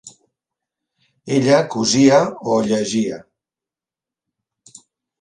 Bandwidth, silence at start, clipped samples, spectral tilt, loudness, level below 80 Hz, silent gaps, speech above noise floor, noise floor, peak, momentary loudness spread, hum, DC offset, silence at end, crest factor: 10.5 kHz; 0.05 s; under 0.1%; -4.5 dB/octave; -16 LUFS; -60 dBFS; none; 73 dB; -89 dBFS; 0 dBFS; 9 LU; none; under 0.1%; 2 s; 20 dB